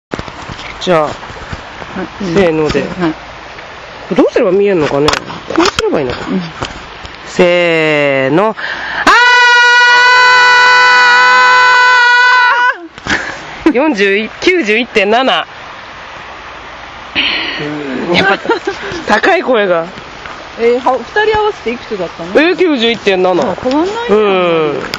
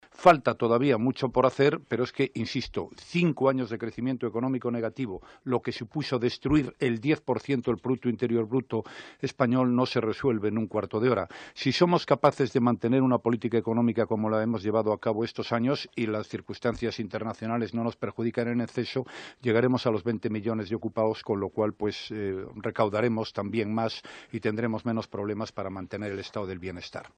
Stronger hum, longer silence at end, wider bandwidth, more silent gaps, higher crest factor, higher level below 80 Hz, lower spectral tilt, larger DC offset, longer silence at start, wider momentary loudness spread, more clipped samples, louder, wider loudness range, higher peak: neither; about the same, 0 s vs 0.1 s; first, 10.5 kHz vs 9.4 kHz; neither; second, 10 dB vs 22 dB; first, -40 dBFS vs -58 dBFS; second, -4 dB/octave vs -7 dB/octave; neither; about the same, 0.1 s vs 0.2 s; first, 21 LU vs 10 LU; neither; first, -9 LUFS vs -28 LUFS; first, 10 LU vs 5 LU; first, 0 dBFS vs -6 dBFS